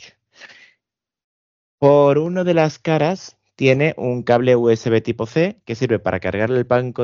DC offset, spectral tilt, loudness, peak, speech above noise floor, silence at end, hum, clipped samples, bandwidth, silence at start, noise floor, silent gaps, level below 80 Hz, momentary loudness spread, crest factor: under 0.1%; -6 dB/octave; -18 LUFS; 0 dBFS; 62 dB; 0 s; none; under 0.1%; 7.2 kHz; 0.45 s; -79 dBFS; 1.24-1.78 s; -56 dBFS; 8 LU; 18 dB